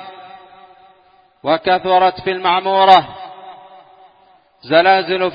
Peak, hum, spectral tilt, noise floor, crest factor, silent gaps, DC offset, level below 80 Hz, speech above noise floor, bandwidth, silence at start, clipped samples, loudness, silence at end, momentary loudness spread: 0 dBFS; none; -6 dB/octave; -52 dBFS; 16 dB; none; under 0.1%; -58 dBFS; 39 dB; 7 kHz; 0 s; under 0.1%; -14 LUFS; 0 s; 22 LU